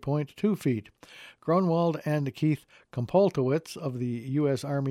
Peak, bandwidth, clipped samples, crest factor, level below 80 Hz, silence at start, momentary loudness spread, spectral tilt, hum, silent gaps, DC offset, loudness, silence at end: -10 dBFS; 15 kHz; under 0.1%; 18 dB; -66 dBFS; 0 s; 11 LU; -8 dB/octave; none; none; under 0.1%; -28 LUFS; 0 s